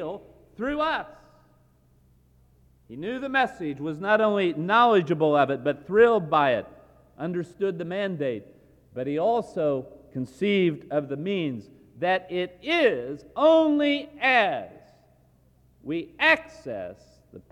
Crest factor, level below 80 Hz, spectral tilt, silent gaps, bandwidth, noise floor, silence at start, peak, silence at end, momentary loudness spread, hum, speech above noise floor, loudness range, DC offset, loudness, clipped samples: 20 dB; -62 dBFS; -6.5 dB/octave; none; 11 kHz; -60 dBFS; 0 s; -6 dBFS; 0.1 s; 16 LU; none; 36 dB; 7 LU; under 0.1%; -24 LUFS; under 0.1%